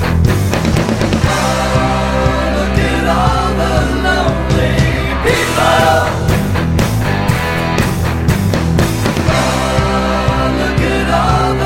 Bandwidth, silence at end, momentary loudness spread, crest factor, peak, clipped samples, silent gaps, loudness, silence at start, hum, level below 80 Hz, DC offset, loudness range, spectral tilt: 16.5 kHz; 0 s; 3 LU; 12 dB; 0 dBFS; under 0.1%; none; -13 LUFS; 0 s; none; -22 dBFS; under 0.1%; 1 LU; -5.5 dB/octave